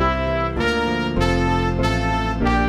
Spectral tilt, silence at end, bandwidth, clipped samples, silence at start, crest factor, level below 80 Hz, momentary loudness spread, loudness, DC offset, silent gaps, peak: -6.5 dB/octave; 0 s; 14 kHz; under 0.1%; 0 s; 16 dB; -28 dBFS; 2 LU; -20 LUFS; under 0.1%; none; -4 dBFS